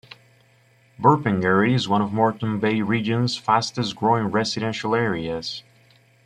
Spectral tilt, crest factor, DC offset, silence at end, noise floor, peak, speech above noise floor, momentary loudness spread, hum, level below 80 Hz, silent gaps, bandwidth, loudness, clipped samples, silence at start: -6 dB/octave; 20 dB; under 0.1%; 0.65 s; -57 dBFS; -2 dBFS; 36 dB; 8 LU; none; -58 dBFS; none; 10.5 kHz; -22 LUFS; under 0.1%; 1 s